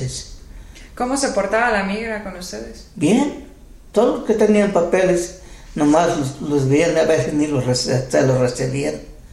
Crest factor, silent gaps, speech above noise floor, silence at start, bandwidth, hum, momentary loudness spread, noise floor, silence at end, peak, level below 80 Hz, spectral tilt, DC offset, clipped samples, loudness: 18 dB; none; 20 dB; 0 s; 13.5 kHz; none; 15 LU; -38 dBFS; 0.05 s; -2 dBFS; -42 dBFS; -5.5 dB/octave; under 0.1%; under 0.1%; -18 LUFS